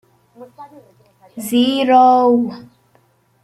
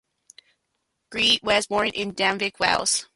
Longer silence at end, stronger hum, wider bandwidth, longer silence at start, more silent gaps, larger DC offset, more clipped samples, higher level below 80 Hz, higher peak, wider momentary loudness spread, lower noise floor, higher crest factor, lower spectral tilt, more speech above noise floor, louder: first, 0.8 s vs 0.1 s; neither; first, 15.5 kHz vs 11.5 kHz; second, 0.4 s vs 1.1 s; neither; neither; neither; second, -66 dBFS vs -56 dBFS; about the same, -2 dBFS vs -4 dBFS; first, 13 LU vs 5 LU; second, -57 dBFS vs -77 dBFS; about the same, 16 dB vs 20 dB; first, -4.5 dB/octave vs -1.5 dB/octave; second, 43 dB vs 53 dB; first, -14 LUFS vs -21 LUFS